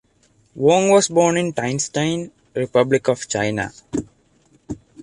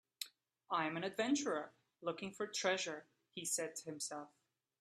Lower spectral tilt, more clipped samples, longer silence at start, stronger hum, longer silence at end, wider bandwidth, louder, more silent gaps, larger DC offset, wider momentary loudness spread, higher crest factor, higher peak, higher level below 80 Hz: first, -4.5 dB/octave vs -2.5 dB/octave; neither; first, 0.55 s vs 0.2 s; neither; second, 0.3 s vs 0.55 s; second, 11.5 kHz vs 15 kHz; first, -19 LUFS vs -41 LUFS; neither; neither; about the same, 14 LU vs 14 LU; about the same, 18 dB vs 22 dB; first, -2 dBFS vs -22 dBFS; first, -52 dBFS vs -88 dBFS